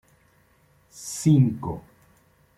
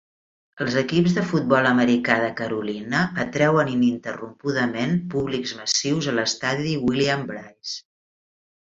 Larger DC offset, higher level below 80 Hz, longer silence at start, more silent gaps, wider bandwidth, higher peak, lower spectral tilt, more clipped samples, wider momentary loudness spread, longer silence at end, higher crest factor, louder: neither; about the same, -56 dBFS vs -58 dBFS; first, 0.95 s vs 0.55 s; neither; first, 14 kHz vs 7.8 kHz; second, -8 dBFS vs -4 dBFS; first, -7 dB/octave vs -5 dB/octave; neither; first, 19 LU vs 11 LU; about the same, 0.8 s vs 0.85 s; about the same, 18 dB vs 20 dB; about the same, -23 LUFS vs -22 LUFS